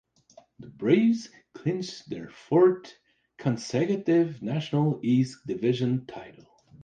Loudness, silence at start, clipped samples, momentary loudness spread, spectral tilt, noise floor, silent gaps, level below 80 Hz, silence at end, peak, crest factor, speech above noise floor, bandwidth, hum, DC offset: -26 LUFS; 0.6 s; under 0.1%; 16 LU; -7.5 dB/octave; -57 dBFS; none; -68 dBFS; 0.55 s; -10 dBFS; 18 dB; 31 dB; 9.2 kHz; none; under 0.1%